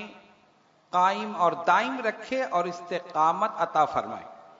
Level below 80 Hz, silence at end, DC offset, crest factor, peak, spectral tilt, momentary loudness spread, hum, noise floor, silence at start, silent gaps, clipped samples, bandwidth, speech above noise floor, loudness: -72 dBFS; 0.15 s; under 0.1%; 20 dB; -8 dBFS; -4.5 dB/octave; 9 LU; none; -62 dBFS; 0 s; none; under 0.1%; 7.8 kHz; 36 dB; -26 LUFS